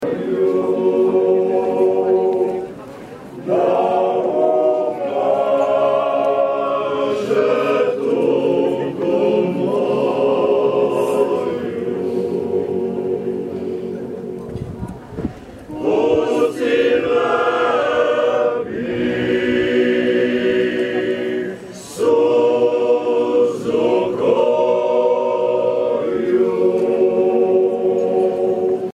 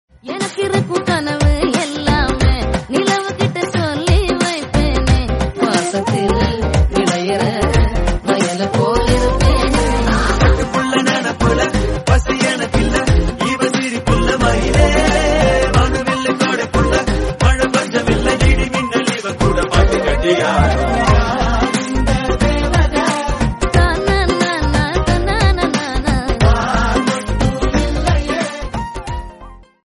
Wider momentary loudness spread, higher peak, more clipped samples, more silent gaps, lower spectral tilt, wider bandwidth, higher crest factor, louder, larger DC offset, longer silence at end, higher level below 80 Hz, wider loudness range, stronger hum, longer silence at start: first, 10 LU vs 4 LU; second, -4 dBFS vs 0 dBFS; neither; neither; about the same, -6.5 dB/octave vs -5.5 dB/octave; about the same, 12 kHz vs 11.5 kHz; about the same, 14 dB vs 14 dB; about the same, -17 LUFS vs -15 LUFS; second, under 0.1% vs 0.2%; second, 0.05 s vs 0.3 s; second, -52 dBFS vs -20 dBFS; first, 5 LU vs 2 LU; neither; second, 0 s vs 0.25 s